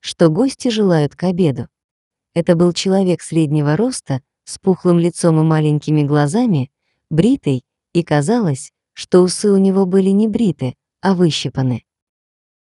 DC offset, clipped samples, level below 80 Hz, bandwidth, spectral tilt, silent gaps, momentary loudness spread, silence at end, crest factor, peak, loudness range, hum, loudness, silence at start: under 0.1%; under 0.1%; -52 dBFS; 11.5 kHz; -6.5 dB/octave; 1.84-2.11 s; 11 LU; 0.85 s; 16 dB; 0 dBFS; 2 LU; none; -16 LUFS; 0.05 s